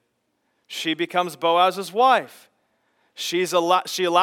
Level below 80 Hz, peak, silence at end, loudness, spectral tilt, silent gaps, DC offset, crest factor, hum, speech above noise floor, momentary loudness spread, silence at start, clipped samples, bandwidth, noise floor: -90 dBFS; -2 dBFS; 0 s; -21 LUFS; -3 dB/octave; none; under 0.1%; 20 dB; none; 51 dB; 10 LU; 0.7 s; under 0.1%; 18 kHz; -72 dBFS